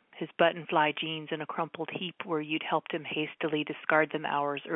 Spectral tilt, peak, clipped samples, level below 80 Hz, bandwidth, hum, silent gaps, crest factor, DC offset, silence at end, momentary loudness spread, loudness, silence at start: -9 dB/octave; -10 dBFS; under 0.1%; -84 dBFS; 4 kHz; none; none; 20 dB; under 0.1%; 0 s; 9 LU; -31 LUFS; 0.15 s